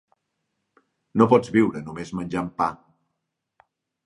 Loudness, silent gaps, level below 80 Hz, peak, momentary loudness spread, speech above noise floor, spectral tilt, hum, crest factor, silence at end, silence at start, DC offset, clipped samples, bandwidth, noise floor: -23 LUFS; none; -58 dBFS; -2 dBFS; 14 LU; 58 dB; -7.5 dB/octave; none; 24 dB; 1.3 s; 1.15 s; under 0.1%; under 0.1%; 11 kHz; -80 dBFS